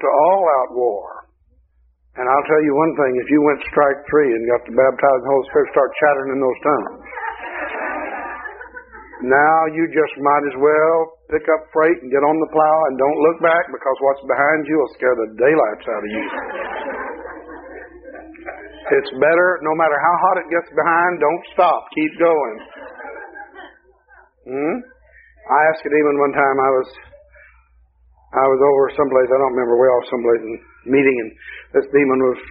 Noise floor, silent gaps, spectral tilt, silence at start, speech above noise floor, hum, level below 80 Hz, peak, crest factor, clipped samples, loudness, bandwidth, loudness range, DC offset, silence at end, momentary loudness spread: -57 dBFS; none; -4.5 dB/octave; 0 s; 41 dB; none; -54 dBFS; -2 dBFS; 16 dB; under 0.1%; -17 LUFS; 4 kHz; 6 LU; under 0.1%; 0 s; 18 LU